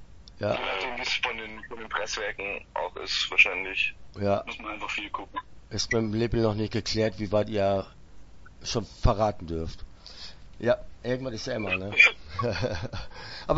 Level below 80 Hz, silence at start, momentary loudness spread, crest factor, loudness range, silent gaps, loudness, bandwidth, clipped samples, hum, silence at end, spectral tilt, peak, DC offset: -42 dBFS; 0 s; 18 LU; 24 dB; 5 LU; none; -27 LUFS; 8 kHz; under 0.1%; none; 0 s; -4.5 dB/octave; -4 dBFS; under 0.1%